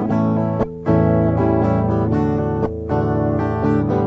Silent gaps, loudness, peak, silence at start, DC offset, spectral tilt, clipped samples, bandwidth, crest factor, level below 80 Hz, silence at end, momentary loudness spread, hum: none; -18 LUFS; -4 dBFS; 0 s; under 0.1%; -10.5 dB/octave; under 0.1%; 6 kHz; 14 dB; -34 dBFS; 0 s; 5 LU; none